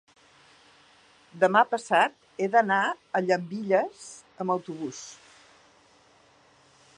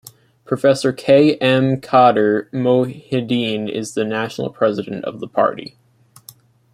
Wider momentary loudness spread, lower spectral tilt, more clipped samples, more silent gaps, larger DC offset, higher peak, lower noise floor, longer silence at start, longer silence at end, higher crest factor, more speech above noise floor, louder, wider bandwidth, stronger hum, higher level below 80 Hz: first, 15 LU vs 12 LU; second, -4.5 dB/octave vs -6 dB/octave; neither; neither; neither; second, -6 dBFS vs -2 dBFS; first, -60 dBFS vs -46 dBFS; first, 1.35 s vs 0.5 s; first, 1.85 s vs 1.1 s; first, 22 dB vs 16 dB; first, 34 dB vs 29 dB; second, -26 LUFS vs -17 LUFS; second, 11 kHz vs 15.5 kHz; neither; second, -80 dBFS vs -60 dBFS